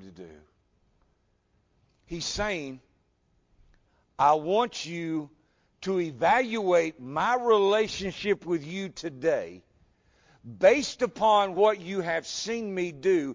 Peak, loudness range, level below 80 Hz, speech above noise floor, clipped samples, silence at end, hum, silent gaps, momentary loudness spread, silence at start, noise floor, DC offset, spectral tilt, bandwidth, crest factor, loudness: -8 dBFS; 11 LU; -58 dBFS; 44 dB; under 0.1%; 0 s; none; none; 12 LU; 0 s; -70 dBFS; under 0.1%; -4.5 dB/octave; 7.6 kHz; 20 dB; -26 LUFS